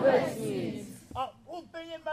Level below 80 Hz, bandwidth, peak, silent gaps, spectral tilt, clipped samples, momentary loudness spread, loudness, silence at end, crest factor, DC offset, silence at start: -62 dBFS; 15.5 kHz; -12 dBFS; none; -5.5 dB/octave; under 0.1%; 15 LU; -34 LUFS; 0 s; 20 dB; under 0.1%; 0 s